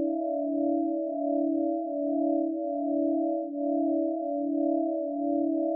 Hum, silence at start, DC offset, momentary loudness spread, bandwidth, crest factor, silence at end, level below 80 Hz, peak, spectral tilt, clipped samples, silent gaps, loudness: none; 0 s; under 0.1%; 3 LU; 0.8 kHz; 12 dB; 0 s; under -90 dBFS; -16 dBFS; -13 dB/octave; under 0.1%; none; -29 LUFS